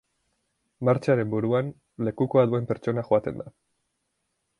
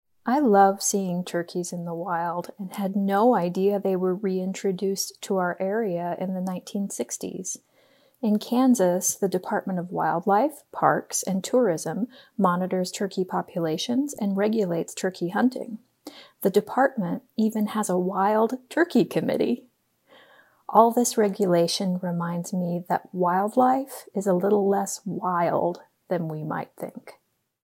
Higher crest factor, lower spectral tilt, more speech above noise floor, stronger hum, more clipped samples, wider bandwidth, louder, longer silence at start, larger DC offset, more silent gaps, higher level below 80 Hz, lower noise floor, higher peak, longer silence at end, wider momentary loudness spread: about the same, 20 dB vs 22 dB; first, -9 dB/octave vs -5 dB/octave; first, 53 dB vs 37 dB; neither; neither; second, 10.5 kHz vs 16.5 kHz; about the same, -25 LUFS vs -25 LUFS; first, 0.8 s vs 0.25 s; neither; neither; first, -62 dBFS vs -78 dBFS; first, -77 dBFS vs -61 dBFS; about the same, -6 dBFS vs -4 dBFS; first, 1.1 s vs 0.6 s; first, 13 LU vs 10 LU